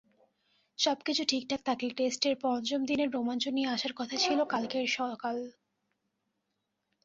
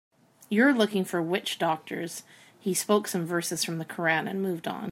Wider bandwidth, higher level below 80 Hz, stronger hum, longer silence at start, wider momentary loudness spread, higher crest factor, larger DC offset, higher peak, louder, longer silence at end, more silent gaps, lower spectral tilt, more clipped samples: second, 8 kHz vs 16 kHz; about the same, -74 dBFS vs -78 dBFS; neither; first, 0.8 s vs 0.4 s; second, 5 LU vs 12 LU; about the same, 18 dB vs 20 dB; neither; second, -14 dBFS vs -8 dBFS; second, -31 LUFS vs -27 LUFS; first, 1.55 s vs 0 s; neither; second, -2.5 dB/octave vs -4 dB/octave; neither